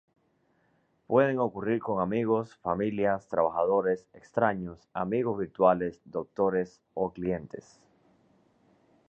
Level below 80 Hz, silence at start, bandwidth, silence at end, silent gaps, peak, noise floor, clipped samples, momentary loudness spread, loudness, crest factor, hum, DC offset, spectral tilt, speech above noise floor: -62 dBFS; 1.1 s; 7.8 kHz; 1.5 s; none; -10 dBFS; -70 dBFS; under 0.1%; 11 LU; -29 LUFS; 20 dB; none; under 0.1%; -8.5 dB/octave; 42 dB